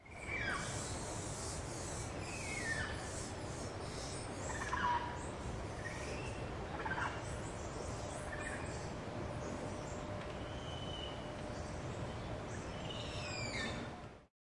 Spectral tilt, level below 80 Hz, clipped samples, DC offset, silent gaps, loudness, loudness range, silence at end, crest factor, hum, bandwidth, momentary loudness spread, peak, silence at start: -4 dB/octave; -54 dBFS; under 0.1%; under 0.1%; none; -43 LUFS; 3 LU; 0.2 s; 18 dB; none; 11.5 kHz; 6 LU; -26 dBFS; 0 s